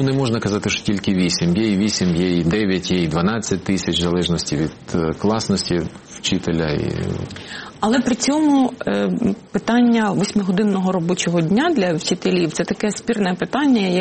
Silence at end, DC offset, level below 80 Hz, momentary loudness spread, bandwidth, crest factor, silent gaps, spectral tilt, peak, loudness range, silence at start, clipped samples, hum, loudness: 0 s; under 0.1%; -44 dBFS; 6 LU; 8.8 kHz; 14 dB; none; -5 dB/octave; -4 dBFS; 3 LU; 0 s; under 0.1%; none; -19 LUFS